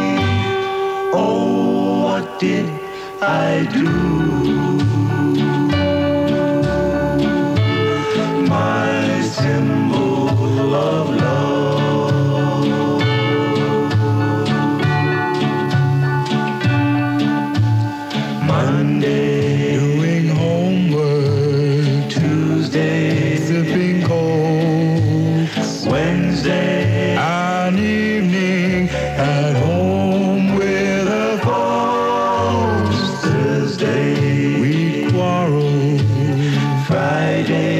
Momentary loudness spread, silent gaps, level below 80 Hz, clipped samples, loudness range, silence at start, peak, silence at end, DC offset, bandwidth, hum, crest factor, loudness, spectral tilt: 2 LU; none; -42 dBFS; under 0.1%; 1 LU; 0 s; -6 dBFS; 0 s; under 0.1%; 12.5 kHz; none; 10 dB; -17 LUFS; -7 dB/octave